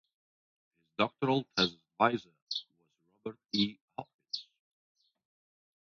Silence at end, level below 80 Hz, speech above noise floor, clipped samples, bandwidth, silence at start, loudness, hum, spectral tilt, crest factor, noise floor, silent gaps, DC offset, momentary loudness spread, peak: 1.4 s; -72 dBFS; 44 dB; under 0.1%; 7.2 kHz; 1 s; -33 LUFS; none; -5 dB/octave; 26 dB; -75 dBFS; 2.42-2.47 s, 3.81-3.88 s, 4.14-4.19 s; under 0.1%; 16 LU; -10 dBFS